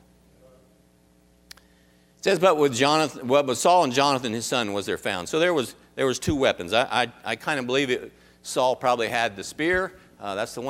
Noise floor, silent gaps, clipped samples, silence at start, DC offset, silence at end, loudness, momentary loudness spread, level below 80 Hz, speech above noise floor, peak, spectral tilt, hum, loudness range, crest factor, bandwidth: -59 dBFS; none; under 0.1%; 2.25 s; under 0.1%; 0 s; -23 LUFS; 10 LU; -54 dBFS; 35 dB; -4 dBFS; -3.5 dB/octave; none; 4 LU; 20 dB; 16 kHz